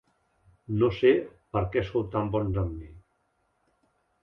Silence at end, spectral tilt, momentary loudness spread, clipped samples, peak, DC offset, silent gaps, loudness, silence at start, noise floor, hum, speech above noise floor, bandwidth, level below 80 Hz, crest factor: 1.25 s; -9.5 dB/octave; 11 LU; under 0.1%; -10 dBFS; under 0.1%; none; -27 LUFS; 0.7 s; -73 dBFS; none; 47 dB; 6 kHz; -46 dBFS; 20 dB